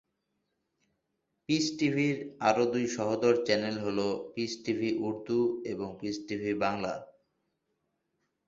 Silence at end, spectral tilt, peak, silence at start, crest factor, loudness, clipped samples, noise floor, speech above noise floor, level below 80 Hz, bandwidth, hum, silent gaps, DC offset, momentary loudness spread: 1.45 s; -5 dB/octave; -10 dBFS; 1.5 s; 22 dB; -31 LUFS; under 0.1%; -81 dBFS; 51 dB; -68 dBFS; 7.8 kHz; none; none; under 0.1%; 9 LU